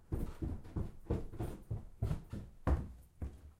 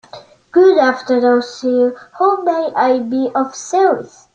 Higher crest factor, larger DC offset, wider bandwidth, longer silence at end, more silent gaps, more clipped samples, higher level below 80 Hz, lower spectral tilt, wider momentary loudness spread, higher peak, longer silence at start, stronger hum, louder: first, 20 dB vs 14 dB; neither; first, 15.5 kHz vs 8.8 kHz; second, 0.05 s vs 0.25 s; neither; neither; first, -44 dBFS vs -62 dBFS; first, -8.5 dB/octave vs -4 dB/octave; first, 11 LU vs 8 LU; second, -22 dBFS vs -2 dBFS; second, 0 s vs 0.15 s; neither; second, -43 LUFS vs -15 LUFS